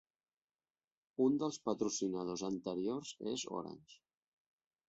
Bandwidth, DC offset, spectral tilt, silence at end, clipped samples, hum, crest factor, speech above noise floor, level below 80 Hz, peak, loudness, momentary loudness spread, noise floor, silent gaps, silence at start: 8 kHz; under 0.1%; -5.5 dB/octave; 0.95 s; under 0.1%; none; 18 dB; over 52 dB; -78 dBFS; -22 dBFS; -39 LUFS; 12 LU; under -90 dBFS; none; 1.2 s